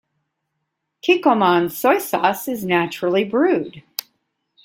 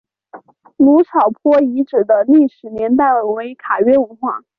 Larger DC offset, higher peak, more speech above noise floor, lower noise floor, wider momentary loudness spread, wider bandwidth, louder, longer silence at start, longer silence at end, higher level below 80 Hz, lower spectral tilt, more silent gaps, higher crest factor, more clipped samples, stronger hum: neither; about the same, 0 dBFS vs -2 dBFS; first, 58 dB vs 27 dB; first, -76 dBFS vs -41 dBFS; first, 13 LU vs 10 LU; first, 17 kHz vs 4.4 kHz; second, -18 LUFS vs -14 LUFS; first, 1.05 s vs 0.35 s; first, 0.85 s vs 0.2 s; second, -64 dBFS vs -58 dBFS; second, -5 dB/octave vs -9 dB/octave; neither; first, 20 dB vs 12 dB; neither; neither